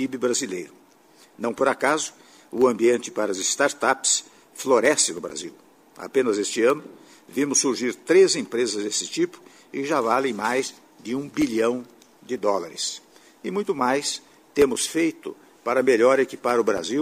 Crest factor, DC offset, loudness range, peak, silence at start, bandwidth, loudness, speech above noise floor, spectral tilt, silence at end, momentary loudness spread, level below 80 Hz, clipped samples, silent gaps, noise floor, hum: 18 dB; under 0.1%; 4 LU; -4 dBFS; 0 s; 15.5 kHz; -23 LUFS; 32 dB; -2.5 dB/octave; 0 s; 14 LU; -64 dBFS; under 0.1%; none; -54 dBFS; none